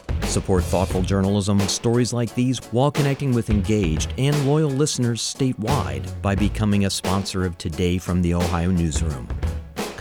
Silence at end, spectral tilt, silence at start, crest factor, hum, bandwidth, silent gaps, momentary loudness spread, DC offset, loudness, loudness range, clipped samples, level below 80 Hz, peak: 0 s; -5.5 dB/octave; 0.1 s; 14 dB; none; 19.5 kHz; none; 6 LU; under 0.1%; -22 LUFS; 2 LU; under 0.1%; -32 dBFS; -6 dBFS